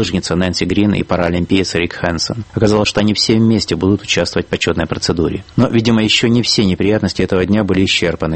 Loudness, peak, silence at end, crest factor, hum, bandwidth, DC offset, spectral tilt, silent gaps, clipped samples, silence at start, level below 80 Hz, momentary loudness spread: -14 LUFS; 0 dBFS; 0 s; 14 dB; none; 8.8 kHz; under 0.1%; -5 dB/octave; none; under 0.1%; 0 s; -36 dBFS; 6 LU